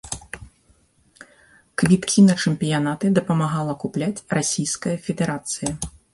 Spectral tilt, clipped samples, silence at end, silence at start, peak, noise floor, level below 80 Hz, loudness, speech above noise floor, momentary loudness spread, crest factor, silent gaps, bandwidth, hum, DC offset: -5 dB/octave; under 0.1%; 0.25 s; 0.05 s; -4 dBFS; -59 dBFS; -50 dBFS; -21 LUFS; 39 dB; 16 LU; 18 dB; none; 11.5 kHz; none; under 0.1%